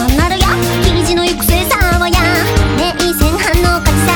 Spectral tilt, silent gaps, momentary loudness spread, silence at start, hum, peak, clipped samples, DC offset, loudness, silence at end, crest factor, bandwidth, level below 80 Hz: -4.5 dB/octave; none; 2 LU; 0 s; none; 0 dBFS; under 0.1%; under 0.1%; -12 LUFS; 0 s; 12 dB; over 20 kHz; -18 dBFS